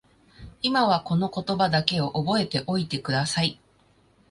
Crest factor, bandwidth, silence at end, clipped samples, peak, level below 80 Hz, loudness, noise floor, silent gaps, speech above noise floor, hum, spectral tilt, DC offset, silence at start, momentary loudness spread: 24 dB; 11.5 kHz; 0.75 s; under 0.1%; -2 dBFS; -56 dBFS; -25 LUFS; -61 dBFS; none; 37 dB; none; -5 dB/octave; under 0.1%; 0.4 s; 5 LU